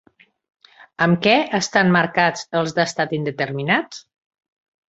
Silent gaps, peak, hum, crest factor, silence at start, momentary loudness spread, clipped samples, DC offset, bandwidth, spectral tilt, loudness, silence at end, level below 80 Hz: none; -2 dBFS; none; 20 dB; 1 s; 8 LU; under 0.1%; under 0.1%; 8 kHz; -5 dB/octave; -19 LUFS; 0.9 s; -60 dBFS